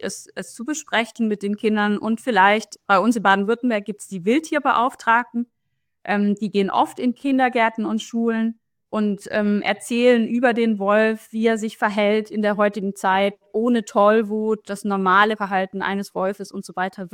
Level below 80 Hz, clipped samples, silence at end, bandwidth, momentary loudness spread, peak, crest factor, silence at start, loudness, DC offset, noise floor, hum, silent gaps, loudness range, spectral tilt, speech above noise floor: -68 dBFS; under 0.1%; 0.05 s; 15.5 kHz; 10 LU; -2 dBFS; 18 dB; 0 s; -20 LUFS; under 0.1%; -77 dBFS; none; none; 2 LU; -5 dB/octave; 57 dB